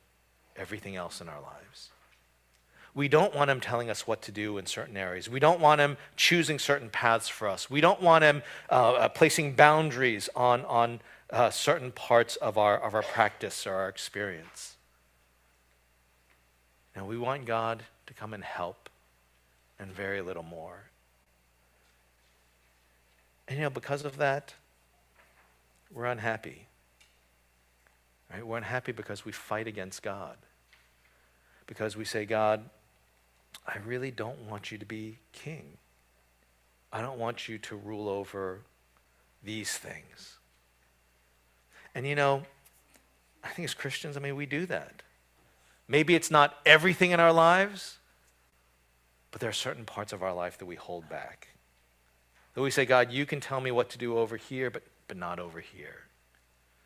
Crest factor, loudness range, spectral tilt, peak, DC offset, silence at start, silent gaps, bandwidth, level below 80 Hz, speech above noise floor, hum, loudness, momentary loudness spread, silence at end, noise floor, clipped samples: 30 dB; 17 LU; -4 dB/octave; -2 dBFS; under 0.1%; 0.55 s; none; 16 kHz; -68 dBFS; 38 dB; 60 Hz at -65 dBFS; -28 LUFS; 22 LU; 0.85 s; -67 dBFS; under 0.1%